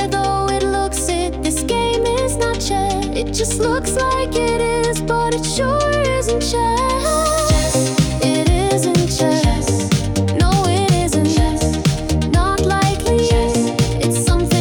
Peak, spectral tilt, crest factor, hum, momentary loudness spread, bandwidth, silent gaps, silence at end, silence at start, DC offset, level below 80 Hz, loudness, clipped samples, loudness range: -4 dBFS; -5 dB/octave; 12 dB; none; 3 LU; 18 kHz; none; 0 s; 0 s; under 0.1%; -26 dBFS; -17 LUFS; under 0.1%; 2 LU